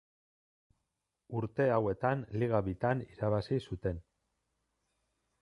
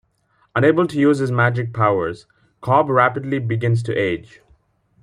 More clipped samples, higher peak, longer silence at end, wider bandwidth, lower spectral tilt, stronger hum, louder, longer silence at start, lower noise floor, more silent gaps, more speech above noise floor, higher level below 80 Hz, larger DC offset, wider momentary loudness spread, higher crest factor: neither; second, -16 dBFS vs -2 dBFS; first, 1.4 s vs 0.8 s; about the same, 11 kHz vs 10.5 kHz; about the same, -9 dB/octave vs -8 dB/octave; neither; second, -34 LUFS vs -18 LUFS; first, 1.3 s vs 0.55 s; first, -86 dBFS vs -62 dBFS; neither; first, 53 dB vs 44 dB; about the same, -56 dBFS vs -56 dBFS; neither; about the same, 9 LU vs 10 LU; about the same, 20 dB vs 18 dB